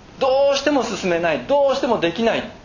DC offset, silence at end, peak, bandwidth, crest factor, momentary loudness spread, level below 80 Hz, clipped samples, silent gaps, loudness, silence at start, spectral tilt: under 0.1%; 0.05 s; -4 dBFS; 7.4 kHz; 14 dB; 4 LU; -50 dBFS; under 0.1%; none; -19 LUFS; 0.15 s; -4.5 dB/octave